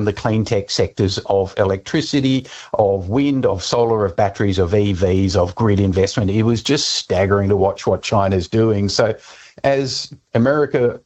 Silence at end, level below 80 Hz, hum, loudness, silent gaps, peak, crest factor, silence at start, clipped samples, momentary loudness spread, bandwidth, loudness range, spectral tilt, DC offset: 0.05 s; -44 dBFS; none; -17 LUFS; none; -2 dBFS; 16 dB; 0 s; under 0.1%; 4 LU; 8.4 kHz; 2 LU; -5.5 dB/octave; under 0.1%